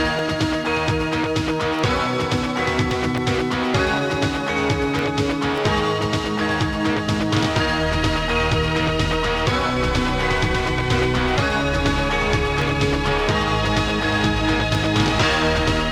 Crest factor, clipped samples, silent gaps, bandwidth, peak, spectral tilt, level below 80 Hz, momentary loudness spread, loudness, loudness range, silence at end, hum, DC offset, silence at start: 14 dB; under 0.1%; none; 15.5 kHz; -6 dBFS; -5 dB/octave; -32 dBFS; 2 LU; -20 LUFS; 2 LU; 0 s; none; under 0.1%; 0 s